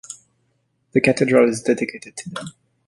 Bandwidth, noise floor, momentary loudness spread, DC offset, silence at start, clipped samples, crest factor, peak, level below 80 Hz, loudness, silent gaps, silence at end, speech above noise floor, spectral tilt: 11.5 kHz; -68 dBFS; 22 LU; under 0.1%; 0.1 s; under 0.1%; 20 dB; -2 dBFS; -60 dBFS; -18 LUFS; none; 0.4 s; 49 dB; -5.5 dB/octave